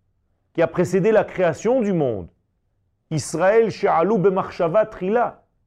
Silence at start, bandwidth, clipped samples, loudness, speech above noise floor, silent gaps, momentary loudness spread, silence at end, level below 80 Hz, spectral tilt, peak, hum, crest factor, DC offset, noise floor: 0.55 s; 13 kHz; under 0.1%; -20 LUFS; 49 dB; none; 9 LU; 0.35 s; -54 dBFS; -6.5 dB/octave; -6 dBFS; none; 14 dB; under 0.1%; -68 dBFS